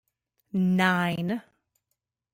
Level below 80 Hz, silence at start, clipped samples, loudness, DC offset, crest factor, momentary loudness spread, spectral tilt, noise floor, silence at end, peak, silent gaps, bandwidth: -68 dBFS; 0.55 s; under 0.1%; -26 LUFS; under 0.1%; 18 dB; 11 LU; -6.5 dB/octave; -82 dBFS; 0.95 s; -10 dBFS; none; 16.5 kHz